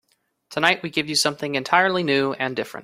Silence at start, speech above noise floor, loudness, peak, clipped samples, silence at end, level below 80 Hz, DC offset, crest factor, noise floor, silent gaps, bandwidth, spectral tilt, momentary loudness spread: 0.5 s; 35 dB; -21 LUFS; 0 dBFS; under 0.1%; 0 s; -64 dBFS; under 0.1%; 22 dB; -57 dBFS; none; 16 kHz; -3 dB/octave; 8 LU